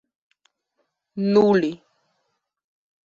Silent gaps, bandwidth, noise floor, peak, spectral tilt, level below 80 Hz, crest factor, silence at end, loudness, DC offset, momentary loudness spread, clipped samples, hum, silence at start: none; 7.2 kHz; -75 dBFS; -6 dBFS; -7.5 dB/octave; -66 dBFS; 20 dB; 1.3 s; -20 LUFS; under 0.1%; 22 LU; under 0.1%; none; 1.15 s